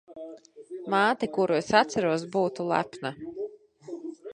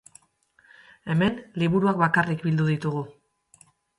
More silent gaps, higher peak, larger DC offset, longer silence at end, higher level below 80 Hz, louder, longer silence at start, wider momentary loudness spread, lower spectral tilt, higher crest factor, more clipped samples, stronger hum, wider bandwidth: neither; about the same, -6 dBFS vs -6 dBFS; neither; second, 0 s vs 0.9 s; second, -68 dBFS vs -58 dBFS; about the same, -26 LUFS vs -24 LUFS; second, 0.1 s vs 1.05 s; first, 20 LU vs 11 LU; second, -5 dB/octave vs -7.5 dB/octave; about the same, 22 dB vs 20 dB; neither; neither; about the same, 10.5 kHz vs 11.5 kHz